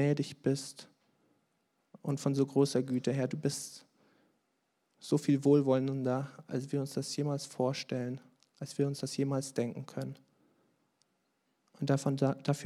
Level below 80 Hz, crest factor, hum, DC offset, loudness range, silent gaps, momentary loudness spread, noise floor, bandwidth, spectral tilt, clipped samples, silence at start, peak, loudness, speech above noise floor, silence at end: -88 dBFS; 20 dB; none; under 0.1%; 6 LU; none; 14 LU; -79 dBFS; 13.5 kHz; -6.5 dB/octave; under 0.1%; 0 s; -14 dBFS; -33 LUFS; 47 dB; 0 s